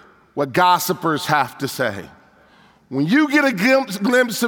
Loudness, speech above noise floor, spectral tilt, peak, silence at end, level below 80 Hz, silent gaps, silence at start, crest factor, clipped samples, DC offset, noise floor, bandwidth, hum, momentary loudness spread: -18 LUFS; 34 dB; -4.5 dB/octave; -2 dBFS; 0 s; -64 dBFS; none; 0.35 s; 18 dB; under 0.1%; under 0.1%; -52 dBFS; over 20 kHz; none; 10 LU